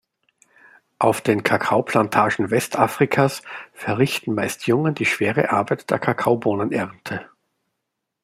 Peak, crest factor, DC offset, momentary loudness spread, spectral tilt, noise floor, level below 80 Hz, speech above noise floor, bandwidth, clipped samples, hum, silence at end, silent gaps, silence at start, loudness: -2 dBFS; 20 dB; under 0.1%; 9 LU; -5.5 dB/octave; -79 dBFS; -62 dBFS; 59 dB; 16 kHz; under 0.1%; none; 1 s; none; 1 s; -20 LUFS